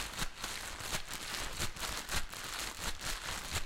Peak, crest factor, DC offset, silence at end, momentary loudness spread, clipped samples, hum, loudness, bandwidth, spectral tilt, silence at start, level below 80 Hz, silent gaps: -20 dBFS; 20 dB; under 0.1%; 0 s; 3 LU; under 0.1%; none; -39 LUFS; 17 kHz; -1.5 dB/octave; 0 s; -46 dBFS; none